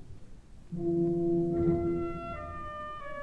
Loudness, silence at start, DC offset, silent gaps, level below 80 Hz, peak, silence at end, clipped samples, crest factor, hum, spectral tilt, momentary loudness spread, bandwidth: -32 LUFS; 0 s; 0.1%; none; -50 dBFS; -16 dBFS; 0 s; under 0.1%; 16 dB; none; -9.5 dB/octave; 12 LU; 4.2 kHz